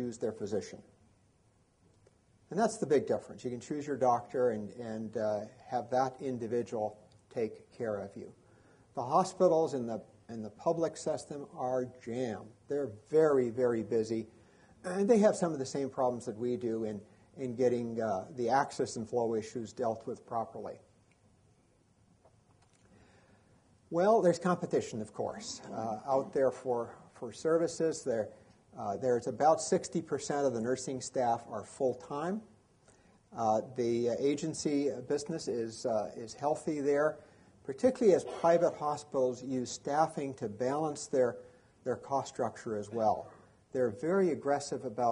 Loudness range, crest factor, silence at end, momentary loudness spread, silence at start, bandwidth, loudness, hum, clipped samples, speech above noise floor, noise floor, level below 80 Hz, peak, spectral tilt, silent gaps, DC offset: 5 LU; 20 dB; 0 s; 13 LU; 0 s; 10.5 kHz; -33 LUFS; none; under 0.1%; 36 dB; -69 dBFS; -72 dBFS; -14 dBFS; -5.5 dB/octave; none; under 0.1%